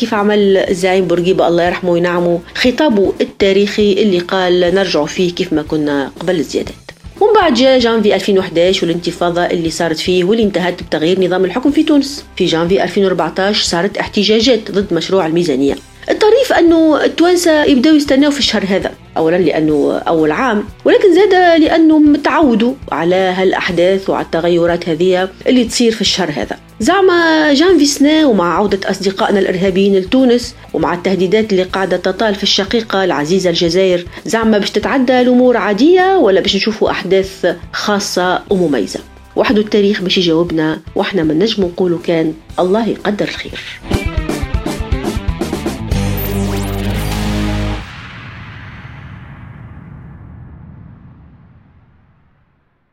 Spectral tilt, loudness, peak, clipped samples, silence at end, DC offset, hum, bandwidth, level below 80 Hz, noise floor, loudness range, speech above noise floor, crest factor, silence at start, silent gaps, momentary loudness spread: -5 dB/octave; -13 LUFS; 0 dBFS; under 0.1%; 2.1 s; under 0.1%; none; 16 kHz; -32 dBFS; -57 dBFS; 8 LU; 45 dB; 12 dB; 0 s; none; 10 LU